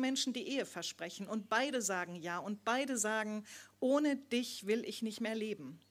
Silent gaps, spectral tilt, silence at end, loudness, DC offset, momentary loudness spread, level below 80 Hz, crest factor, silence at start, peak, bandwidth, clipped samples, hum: none; -3 dB/octave; 0.15 s; -37 LUFS; under 0.1%; 9 LU; -88 dBFS; 18 dB; 0 s; -20 dBFS; 16.5 kHz; under 0.1%; none